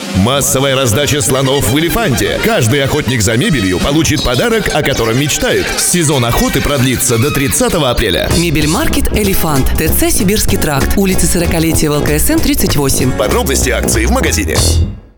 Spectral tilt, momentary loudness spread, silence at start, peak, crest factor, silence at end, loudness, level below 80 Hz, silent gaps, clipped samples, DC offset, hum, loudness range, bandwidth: -4 dB/octave; 2 LU; 0 s; 0 dBFS; 12 dB; 0.15 s; -11 LUFS; -20 dBFS; none; under 0.1%; under 0.1%; none; 1 LU; over 20 kHz